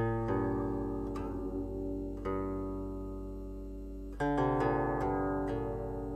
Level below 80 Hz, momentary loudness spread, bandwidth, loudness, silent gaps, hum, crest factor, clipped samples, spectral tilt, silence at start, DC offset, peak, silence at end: -44 dBFS; 13 LU; 9.2 kHz; -36 LUFS; none; none; 16 dB; under 0.1%; -9 dB/octave; 0 s; under 0.1%; -18 dBFS; 0 s